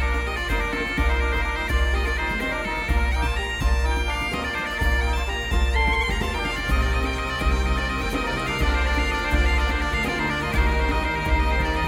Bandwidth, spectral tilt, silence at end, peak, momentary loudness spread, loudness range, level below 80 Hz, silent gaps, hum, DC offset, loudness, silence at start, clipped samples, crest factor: 15.5 kHz; -5 dB/octave; 0 s; -10 dBFS; 3 LU; 1 LU; -24 dBFS; none; none; under 0.1%; -23 LUFS; 0 s; under 0.1%; 14 dB